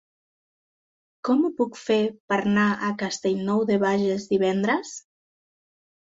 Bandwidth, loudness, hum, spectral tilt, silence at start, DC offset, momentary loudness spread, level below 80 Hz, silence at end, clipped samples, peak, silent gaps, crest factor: 7.8 kHz; -24 LUFS; none; -5.5 dB/octave; 1.25 s; under 0.1%; 6 LU; -66 dBFS; 1.05 s; under 0.1%; -10 dBFS; 2.20-2.28 s; 16 dB